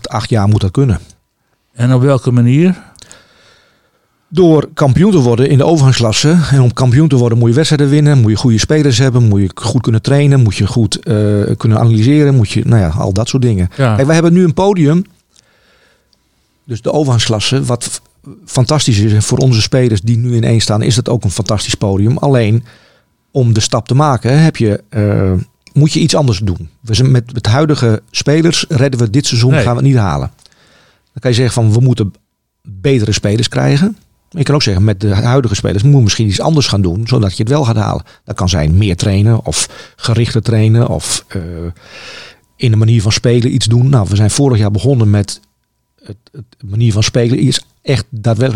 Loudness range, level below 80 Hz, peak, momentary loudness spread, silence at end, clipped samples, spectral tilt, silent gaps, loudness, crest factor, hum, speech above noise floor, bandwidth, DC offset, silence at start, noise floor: 5 LU; -38 dBFS; 0 dBFS; 8 LU; 0 s; under 0.1%; -6 dB/octave; none; -11 LUFS; 12 dB; none; 53 dB; 11.5 kHz; 0.6%; 0.05 s; -63 dBFS